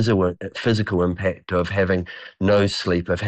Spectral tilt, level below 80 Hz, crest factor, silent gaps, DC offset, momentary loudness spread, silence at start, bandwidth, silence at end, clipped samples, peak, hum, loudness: -6.5 dB/octave; -46 dBFS; 12 dB; none; under 0.1%; 6 LU; 0 s; 8.8 kHz; 0 s; under 0.1%; -10 dBFS; none; -21 LUFS